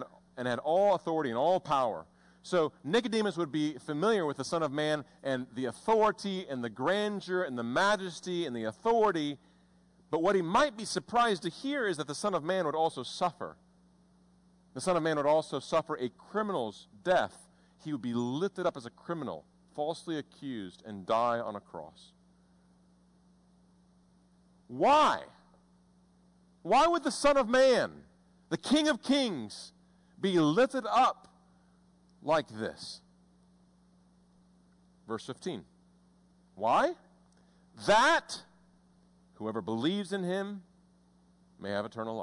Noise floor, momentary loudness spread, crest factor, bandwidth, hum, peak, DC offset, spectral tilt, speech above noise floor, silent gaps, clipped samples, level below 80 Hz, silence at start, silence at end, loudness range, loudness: -65 dBFS; 17 LU; 14 dB; 11 kHz; none; -18 dBFS; under 0.1%; -4.5 dB/octave; 34 dB; none; under 0.1%; -66 dBFS; 0 s; 0 s; 8 LU; -31 LUFS